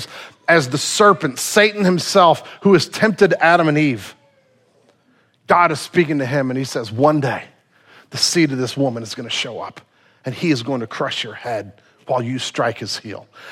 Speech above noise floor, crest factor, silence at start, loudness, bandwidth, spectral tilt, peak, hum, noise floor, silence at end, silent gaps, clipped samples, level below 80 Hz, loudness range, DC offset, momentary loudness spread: 41 dB; 18 dB; 0 s; -17 LUFS; 16 kHz; -4.5 dB/octave; 0 dBFS; none; -58 dBFS; 0 s; none; under 0.1%; -62 dBFS; 8 LU; under 0.1%; 15 LU